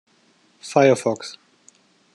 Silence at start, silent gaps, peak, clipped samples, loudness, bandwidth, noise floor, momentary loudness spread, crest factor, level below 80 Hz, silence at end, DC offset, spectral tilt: 0.65 s; none; -2 dBFS; under 0.1%; -19 LUFS; 12 kHz; -59 dBFS; 21 LU; 22 dB; -74 dBFS; 0.8 s; under 0.1%; -5 dB/octave